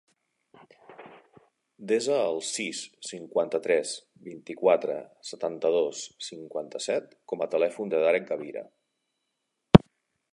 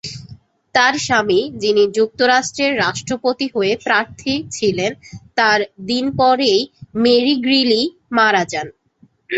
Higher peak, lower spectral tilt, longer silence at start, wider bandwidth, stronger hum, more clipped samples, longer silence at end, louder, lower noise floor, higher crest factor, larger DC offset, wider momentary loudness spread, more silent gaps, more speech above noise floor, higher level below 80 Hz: about the same, 0 dBFS vs -2 dBFS; first, -5.5 dB/octave vs -3.5 dB/octave; first, 0.9 s vs 0.05 s; first, 11.5 kHz vs 8.2 kHz; neither; neither; first, 0.55 s vs 0 s; second, -27 LUFS vs -16 LUFS; first, -80 dBFS vs -54 dBFS; first, 28 dB vs 16 dB; neither; first, 17 LU vs 9 LU; neither; first, 52 dB vs 38 dB; about the same, -50 dBFS vs -54 dBFS